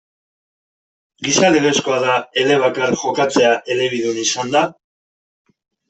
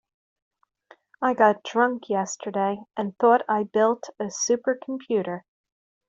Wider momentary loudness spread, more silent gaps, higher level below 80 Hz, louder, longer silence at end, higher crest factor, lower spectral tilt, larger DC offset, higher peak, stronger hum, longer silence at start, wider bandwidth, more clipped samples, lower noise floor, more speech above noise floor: second, 6 LU vs 11 LU; neither; first, -60 dBFS vs -72 dBFS; first, -16 LUFS vs -24 LUFS; first, 1.15 s vs 0.7 s; about the same, 16 dB vs 20 dB; about the same, -3 dB/octave vs -4 dB/octave; neither; first, -2 dBFS vs -6 dBFS; neither; about the same, 1.2 s vs 1.2 s; about the same, 8.4 kHz vs 8 kHz; neither; first, under -90 dBFS vs -57 dBFS; first, over 74 dB vs 33 dB